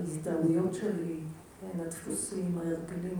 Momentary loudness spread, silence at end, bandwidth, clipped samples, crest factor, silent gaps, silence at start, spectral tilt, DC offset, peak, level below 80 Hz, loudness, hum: 12 LU; 0 s; over 20 kHz; under 0.1%; 16 dB; none; 0 s; -6.5 dB/octave; under 0.1%; -18 dBFS; -64 dBFS; -33 LUFS; none